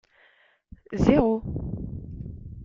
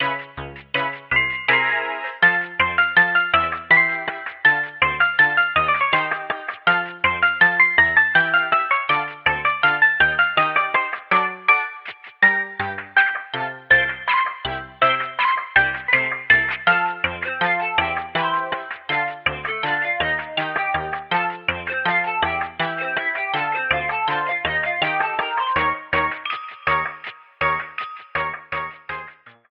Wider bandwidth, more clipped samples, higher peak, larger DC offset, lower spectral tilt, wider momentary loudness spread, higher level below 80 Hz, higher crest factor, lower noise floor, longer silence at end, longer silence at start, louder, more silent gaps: first, 7.6 kHz vs 5.6 kHz; neither; about the same, -4 dBFS vs -2 dBFS; neither; first, -8.5 dB/octave vs -6 dB/octave; first, 19 LU vs 12 LU; first, -40 dBFS vs -52 dBFS; first, 24 dB vs 18 dB; first, -61 dBFS vs -42 dBFS; second, 0 s vs 0.2 s; first, 0.9 s vs 0 s; second, -25 LUFS vs -19 LUFS; neither